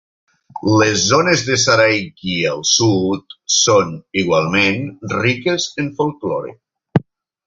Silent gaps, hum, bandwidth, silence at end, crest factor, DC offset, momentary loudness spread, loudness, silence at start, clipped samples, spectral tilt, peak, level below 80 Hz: none; none; 7.8 kHz; 0.45 s; 16 dB; under 0.1%; 11 LU; -16 LUFS; 0.55 s; under 0.1%; -3.5 dB/octave; 0 dBFS; -48 dBFS